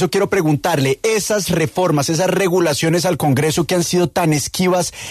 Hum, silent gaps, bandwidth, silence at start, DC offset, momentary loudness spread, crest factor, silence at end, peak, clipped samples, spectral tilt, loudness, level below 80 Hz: none; none; 14 kHz; 0 s; under 0.1%; 2 LU; 12 dB; 0 s; -4 dBFS; under 0.1%; -4.5 dB/octave; -16 LUFS; -48 dBFS